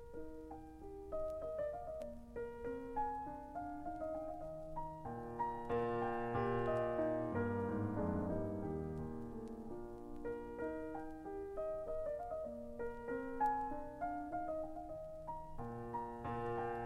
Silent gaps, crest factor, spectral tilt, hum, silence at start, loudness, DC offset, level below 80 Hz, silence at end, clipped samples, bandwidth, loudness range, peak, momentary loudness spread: none; 16 dB; -8.5 dB/octave; none; 0 s; -43 LUFS; under 0.1%; -56 dBFS; 0 s; under 0.1%; 15 kHz; 6 LU; -26 dBFS; 11 LU